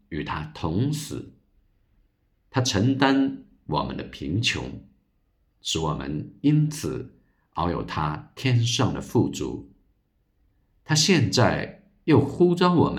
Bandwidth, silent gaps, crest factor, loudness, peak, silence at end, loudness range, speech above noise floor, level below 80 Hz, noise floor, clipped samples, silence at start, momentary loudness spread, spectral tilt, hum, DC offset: 15.5 kHz; none; 20 dB; -24 LUFS; -4 dBFS; 0 s; 4 LU; 45 dB; -50 dBFS; -68 dBFS; under 0.1%; 0.1 s; 15 LU; -5 dB/octave; none; under 0.1%